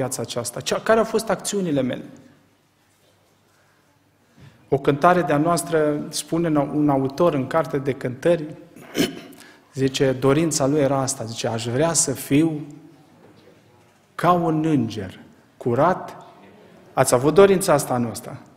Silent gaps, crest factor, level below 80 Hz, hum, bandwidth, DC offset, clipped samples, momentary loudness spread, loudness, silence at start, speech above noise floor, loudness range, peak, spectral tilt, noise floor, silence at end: none; 22 dB; -54 dBFS; none; 16 kHz; under 0.1%; under 0.1%; 12 LU; -21 LUFS; 0 s; 40 dB; 5 LU; 0 dBFS; -5 dB/octave; -61 dBFS; 0.2 s